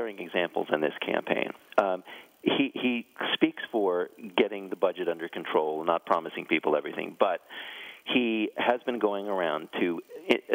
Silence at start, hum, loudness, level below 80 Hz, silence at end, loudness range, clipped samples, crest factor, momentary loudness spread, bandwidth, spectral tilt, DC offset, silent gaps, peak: 0 s; none; -29 LUFS; -82 dBFS; 0 s; 1 LU; under 0.1%; 26 dB; 6 LU; 16 kHz; -5.5 dB/octave; under 0.1%; none; -4 dBFS